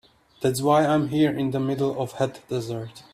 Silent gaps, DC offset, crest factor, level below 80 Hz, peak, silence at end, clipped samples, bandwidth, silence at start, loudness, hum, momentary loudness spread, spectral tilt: none; under 0.1%; 18 dB; -60 dBFS; -6 dBFS; 0.1 s; under 0.1%; 15.5 kHz; 0.4 s; -24 LUFS; none; 10 LU; -6.5 dB/octave